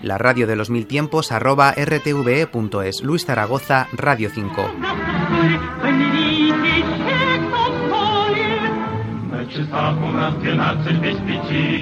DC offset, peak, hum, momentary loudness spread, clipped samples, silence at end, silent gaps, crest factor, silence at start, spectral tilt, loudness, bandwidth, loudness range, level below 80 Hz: under 0.1%; 0 dBFS; none; 7 LU; under 0.1%; 0 s; none; 18 dB; 0 s; -6 dB/octave; -19 LUFS; 16 kHz; 3 LU; -44 dBFS